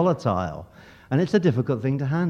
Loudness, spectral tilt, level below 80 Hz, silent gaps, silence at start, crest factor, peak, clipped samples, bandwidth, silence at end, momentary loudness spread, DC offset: -24 LUFS; -8.5 dB/octave; -54 dBFS; none; 0 s; 16 dB; -8 dBFS; under 0.1%; 8.2 kHz; 0 s; 9 LU; under 0.1%